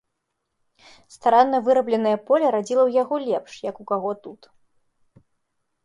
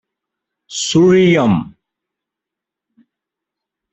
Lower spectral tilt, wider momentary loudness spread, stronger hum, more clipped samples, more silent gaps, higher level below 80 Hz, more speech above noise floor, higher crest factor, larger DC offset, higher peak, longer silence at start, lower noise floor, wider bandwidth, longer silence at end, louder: about the same, -5.5 dB/octave vs -5.5 dB/octave; second, 12 LU vs 16 LU; neither; neither; neither; second, -72 dBFS vs -52 dBFS; second, 57 dB vs 72 dB; about the same, 20 dB vs 16 dB; neither; about the same, -2 dBFS vs -2 dBFS; first, 1.25 s vs 0.7 s; second, -78 dBFS vs -84 dBFS; first, 11 kHz vs 8.4 kHz; second, 1.5 s vs 2.25 s; second, -21 LUFS vs -13 LUFS